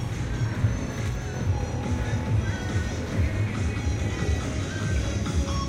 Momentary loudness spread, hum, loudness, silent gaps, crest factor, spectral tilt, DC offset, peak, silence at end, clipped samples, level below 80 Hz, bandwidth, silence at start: 3 LU; none; -28 LUFS; none; 14 dB; -6 dB/octave; under 0.1%; -12 dBFS; 0 s; under 0.1%; -32 dBFS; 12.5 kHz; 0 s